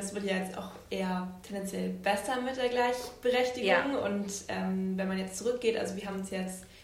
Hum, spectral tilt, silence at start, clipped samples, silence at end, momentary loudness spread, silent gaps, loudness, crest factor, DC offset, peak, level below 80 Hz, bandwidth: none; -4.5 dB/octave; 0 s; under 0.1%; 0 s; 10 LU; none; -32 LUFS; 20 dB; under 0.1%; -12 dBFS; -62 dBFS; 16 kHz